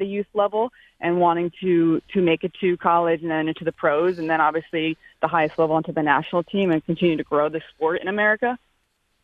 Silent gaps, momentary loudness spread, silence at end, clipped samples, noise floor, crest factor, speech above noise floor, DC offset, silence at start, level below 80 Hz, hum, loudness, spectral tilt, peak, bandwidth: none; 6 LU; 0.65 s; under 0.1%; -69 dBFS; 18 dB; 47 dB; under 0.1%; 0 s; -60 dBFS; none; -22 LUFS; -8.5 dB/octave; -2 dBFS; 5 kHz